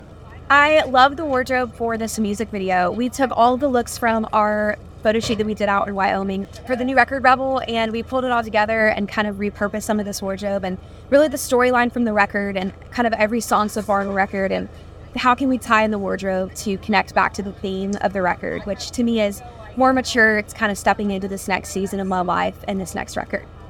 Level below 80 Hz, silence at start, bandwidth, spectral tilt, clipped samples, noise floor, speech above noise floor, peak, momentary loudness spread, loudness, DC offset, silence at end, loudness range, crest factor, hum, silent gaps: -44 dBFS; 0 s; 18 kHz; -4.5 dB/octave; under 0.1%; -39 dBFS; 19 dB; 0 dBFS; 10 LU; -20 LUFS; under 0.1%; 0 s; 2 LU; 20 dB; none; none